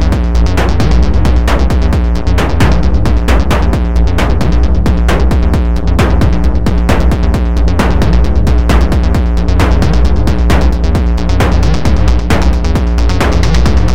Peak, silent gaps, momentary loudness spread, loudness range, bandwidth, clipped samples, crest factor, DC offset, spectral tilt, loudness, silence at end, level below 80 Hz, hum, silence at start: 0 dBFS; none; 2 LU; 0 LU; 11.5 kHz; 0.1%; 10 dB; 20%; -6.5 dB/octave; -11 LUFS; 0 s; -10 dBFS; none; 0 s